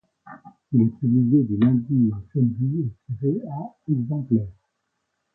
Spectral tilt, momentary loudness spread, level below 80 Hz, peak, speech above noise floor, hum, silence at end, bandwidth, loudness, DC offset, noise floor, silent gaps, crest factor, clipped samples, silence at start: -13 dB/octave; 10 LU; -54 dBFS; -8 dBFS; 55 dB; none; 0.85 s; 4 kHz; -22 LUFS; under 0.1%; -76 dBFS; none; 16 dB; under 0.1%; 0.25 s